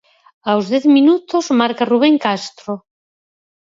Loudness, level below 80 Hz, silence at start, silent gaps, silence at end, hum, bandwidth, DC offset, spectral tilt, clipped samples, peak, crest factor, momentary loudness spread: -15 LUFS; -68 dBFS; 0.45 s; none; 0.85 s; none; 7.8 kHz; under 0.1%; -5 dB/octave; under 0.1%; 0 dBFS; 16 dB; 16 LU